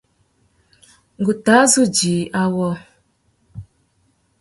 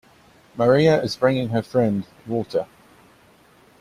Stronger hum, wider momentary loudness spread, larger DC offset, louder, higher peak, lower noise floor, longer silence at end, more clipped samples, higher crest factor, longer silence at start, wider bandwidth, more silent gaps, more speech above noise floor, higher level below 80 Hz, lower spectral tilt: neither; first, 27 LU vs 12 LU; neither; first, -16 LUFS vs -21 LUFS; first, 0 dBFS vs -4 dBFS; first, -63 dBFS vs -54 dBFS; second, 0.8 s vs 1.15 s; neither; about the same, 20 dB vs 18 dB; first, 1.2 s vs 0.55 s; second, 12 kHz vs 14 kHz; neither; first, 47 dB vs 34 dB; about the same, -56 dBFS vs -56 dBFS; second, -4 dB/octave vs -7 dB/octave